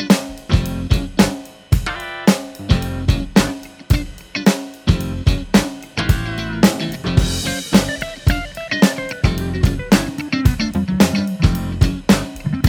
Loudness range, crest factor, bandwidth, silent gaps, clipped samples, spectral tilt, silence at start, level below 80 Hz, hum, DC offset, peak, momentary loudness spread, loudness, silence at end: 2 LU; 16 dB; 19 kHz; none; under 0.1%; -5.5 dB/octave; 0 s; -26 dBFS; none; under 0.1%; 0 dBFS; 7 LU; -18 LUFS; 0 s